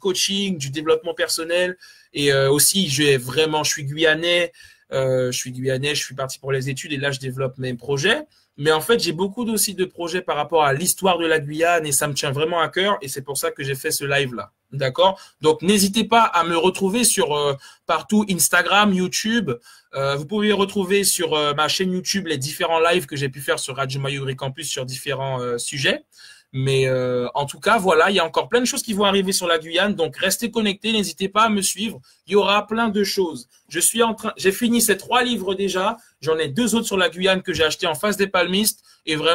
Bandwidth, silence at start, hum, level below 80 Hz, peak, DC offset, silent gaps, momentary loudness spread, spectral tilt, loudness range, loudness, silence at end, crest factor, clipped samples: 16 kHz; 0.05 s; none; -56 dBFS; -2 dBFS; under 0.1%; none; 9 LU; -3.5 dB/octave; 5 LU; -20 LUFS; 0 s; 18 dB; under 0.1%